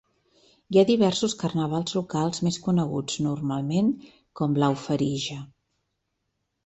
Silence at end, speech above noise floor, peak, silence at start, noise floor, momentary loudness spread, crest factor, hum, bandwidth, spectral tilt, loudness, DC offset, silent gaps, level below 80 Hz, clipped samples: 1.2 s; 54 dB; -6 dBFS; 0.7 s; -78 dBFS; 8 LU; 20 dB; none; 8.2 kHz; -6 dB/octave; -25 LUFS; under 0.1%; none; -60 dBFS; under 0.1%